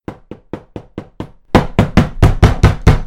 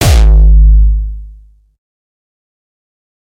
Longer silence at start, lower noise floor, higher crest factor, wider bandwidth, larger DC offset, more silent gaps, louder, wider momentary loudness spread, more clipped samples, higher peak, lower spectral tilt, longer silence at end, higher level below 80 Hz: about the same, 0.1 s vs 0 s; second, -32 dBFS vs -37 dBFS; about the same, 14 dB vs 10 dB; about the same, 13.5 kHz vs 14.5 kHz; neither; neither; second, -13 LUFS vs -9 LUFS; first, 21 LU vs 16 LU; first, 1% vs under 0.1%; about the same, 0 dBFS vs 0 dBFS; first, -7 dB/octave vs -5.5 dB/octave; second, 0 s vs 1.95 s; second, -18 dBFS vs -10 dBFS